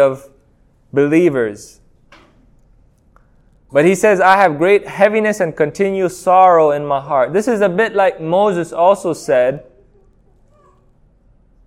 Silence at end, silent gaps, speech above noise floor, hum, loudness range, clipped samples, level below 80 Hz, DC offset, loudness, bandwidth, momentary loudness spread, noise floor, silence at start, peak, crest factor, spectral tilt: 2.05 s; none; 39 dB; none; 7 LU; under 0.1%; -52 dBFS; under 0.1%; -14 LUFS; 15.5 kHz; 8 LU; -53 dBFS; 0 s; 0 dBFS; 16 dB; -5.5 dB/octave